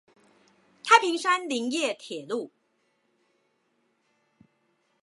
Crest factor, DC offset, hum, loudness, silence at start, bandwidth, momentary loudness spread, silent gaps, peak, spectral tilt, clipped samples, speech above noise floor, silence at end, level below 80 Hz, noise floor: 26 dB; under 0.1%; none; -25 LUFS; 0.85 s; 11.5 kHz; 17 LU; none; -4 dBFS; -1.5 dB/octave; under 0.1%; 44 dB; 2.55 s; -88 dBFS; -72 dBFS